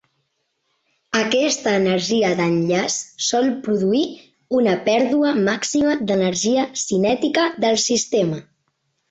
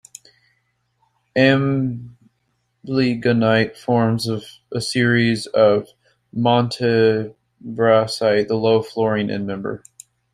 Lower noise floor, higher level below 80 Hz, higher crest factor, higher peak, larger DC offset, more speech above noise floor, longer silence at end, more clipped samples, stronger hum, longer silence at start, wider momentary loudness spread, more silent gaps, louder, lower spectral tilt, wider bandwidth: about the same, -71 dBFS vs -69 dBFS; about the same, -60 dBFS vs -56 dBFS; about the same, 14 dB vs 18 dB; second, -6 dBFS vs -2 dBFS; neither; about the same, 53 dB vs 51 dB; first, 0.7 s vs 0.55 s; neither; neither; second, 1.1 s vs 1.35 s; second, 4 LU vs 13 LU; neither; about the same, -19 LUFS vs -19 LUFS; second, -4 dB/octave vs -6 dB/octave; second, 8.4 kHz vs 14.5 kHz